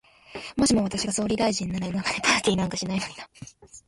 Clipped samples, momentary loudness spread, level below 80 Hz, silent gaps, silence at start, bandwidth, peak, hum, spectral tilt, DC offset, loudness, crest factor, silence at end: under 0.1%; 20 LU; -50 dBFS; none; 0.3 s; 11.5 kHz; -6 dBFS; none; -3.5 dB/octave; under 0.1%; -25 LUFS; 20 dB; 0.1 s